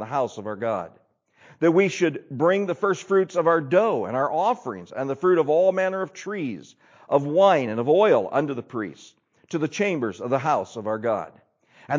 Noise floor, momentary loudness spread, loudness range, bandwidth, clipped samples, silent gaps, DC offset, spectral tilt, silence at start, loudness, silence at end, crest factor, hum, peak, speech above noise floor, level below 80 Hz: -55 dBFS; 12 LU; 3 LU; 7.6 kHz; under 0.1%; none; under 0.1%; -6 dB/octave; 0 s; -23 LUFS; 0 s; 18 dB; none; -6 dBFS; 32 dB; -70 dBFS